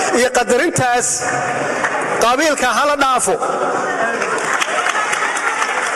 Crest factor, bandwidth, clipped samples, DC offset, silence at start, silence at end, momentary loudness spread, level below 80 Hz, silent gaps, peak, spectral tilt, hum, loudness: 12 dB; 13.5 kHz; under 0.1%; under 0.1%; 0 s; 0 s; 4 LU; -50 dBFS; none; -4 dBFS; -2 dB/octave; none; -16 LUFS